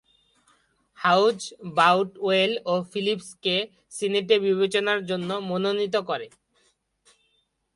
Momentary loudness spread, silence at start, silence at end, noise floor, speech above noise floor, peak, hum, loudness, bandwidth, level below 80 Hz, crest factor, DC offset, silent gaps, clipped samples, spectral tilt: 10 LU; 1 s; 1.5 s; -71 dBFS; 47 dB; -4 dBFS; none; -24 LUFS; 11.5 kHz; -70 dBFS; 22 dB; under 0.1%; none; under 0.1%; -4.5 dB/octave